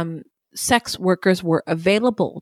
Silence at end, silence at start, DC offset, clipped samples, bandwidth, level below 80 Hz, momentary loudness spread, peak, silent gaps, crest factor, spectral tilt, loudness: 0 s; 0 s; under 0.1%; under 0.1%; 16 kHz; -52 dBFS; 11 LU; -2 dBFS; none; 20 dB; -4.5 dB/octave; -20 LUFS